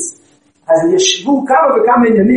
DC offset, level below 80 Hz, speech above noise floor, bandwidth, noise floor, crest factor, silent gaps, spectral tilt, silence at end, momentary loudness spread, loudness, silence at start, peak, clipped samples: under 0.1%; -54 dBFS; 41 dB; 11 kHz; -51 dBFS; 12 dB; none; -3.5 dB/octave; 0 s; 5 LU; -11 LUFS; 0 s; 0 dBFS; under 0.1%